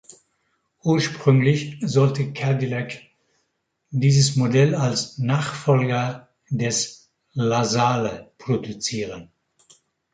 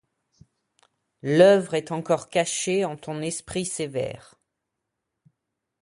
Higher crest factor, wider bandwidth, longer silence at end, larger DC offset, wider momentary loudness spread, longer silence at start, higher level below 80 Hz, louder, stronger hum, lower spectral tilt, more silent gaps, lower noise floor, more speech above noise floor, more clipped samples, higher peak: about the same, 20 dB vs 22 dB; second, 9.4 kHz vs 11.5 kHz; second, 0.9 s vs 1.65 s; neither; about the same, 12 LU vs 14 LU; second, 0.85 s vs 1.25 s; about the same, -60 dBFS vs -62 dBFS; about the same, -22 LUFS vs -24 LUFS; neither; about the same, -5.5 dB/octave vs -4.5 dB/octave; neither; second, -74 dBFS vs -82 dBFS; second, 53 dB vs 59 dB; neither; about the same, -4 dBFS vs -4 dBFS